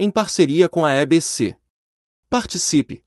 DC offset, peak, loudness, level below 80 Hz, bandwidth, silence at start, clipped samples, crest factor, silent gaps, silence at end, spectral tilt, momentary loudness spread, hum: under 0.1%; -2 dBFS; -18 LUFS; -52 dBFS; 12 kHz; 0 s; under 0.1%; 18 dB; 1.70-2.23 s; 0.1 s; -4.5 dB/octave; 8 LU; none